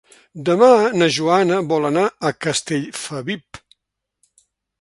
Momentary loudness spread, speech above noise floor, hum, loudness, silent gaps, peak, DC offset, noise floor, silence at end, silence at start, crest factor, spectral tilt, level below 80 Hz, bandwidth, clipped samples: 14 LU; 60 dB; none; -18 LUFS; none; 0 dBFS; under 0.1%; -77 dBFS; 1.25 s; 0.35 s; 18 dB; -4.5 dB/octave; -60 dBFS; 11.5 kHz; under 0.1%